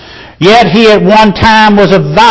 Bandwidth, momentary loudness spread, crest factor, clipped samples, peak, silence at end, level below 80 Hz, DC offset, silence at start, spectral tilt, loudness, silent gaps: 8 kHz; 2 LU; 4 dB; 9%; 0 dBFS; 0 s; -28 dBFS; under 0.1%; 0.15 s; -5.5 dB/octave; -5 LUFS; none